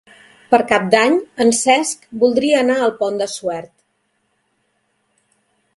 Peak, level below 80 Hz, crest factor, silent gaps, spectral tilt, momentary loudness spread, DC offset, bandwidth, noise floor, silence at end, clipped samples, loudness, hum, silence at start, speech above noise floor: 0 dBFS; -62 dBFS; 18 dB; none; -3 dB/octave; 9 LU; under 0.1%; 11.5 kHz; -67 dBFS; 2.1 s; under 0.1%; -16 LUFS; none; 0.5 s; 51 dB